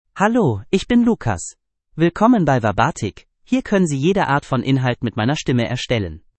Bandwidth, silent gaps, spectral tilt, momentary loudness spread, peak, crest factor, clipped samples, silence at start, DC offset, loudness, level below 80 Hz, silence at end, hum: 8.8 kHz; none; -6 dB/octave; 8 LU; 0 dBFS; 18 dB; under 0.1%; 0.15 s; under 0.1%; -18 LUFS; -44 dBFS; 0.2 s; none